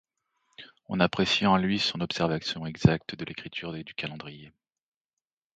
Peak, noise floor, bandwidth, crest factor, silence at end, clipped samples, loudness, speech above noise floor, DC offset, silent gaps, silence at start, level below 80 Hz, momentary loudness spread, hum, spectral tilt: -4 dBFS; under -90 dBFS; 8.8 kHz; 24 dB; 1.1 s; under 0.1%; -27 LUFS; over 62 dB; under 0.1%; none; 0.6 s; -54 dBFS; 14 LU; none; -5.5 dB/octave